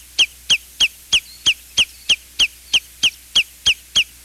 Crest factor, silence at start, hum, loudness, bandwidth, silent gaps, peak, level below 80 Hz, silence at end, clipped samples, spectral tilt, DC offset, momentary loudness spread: 14 dB; 0.2 s; none; -17 LUFS; 16.5 kHz; none; -4 dBFS; -48 dBFS; 0.2 s; under 0.1%; 2 dB/octave; under 0.1%; 4 LU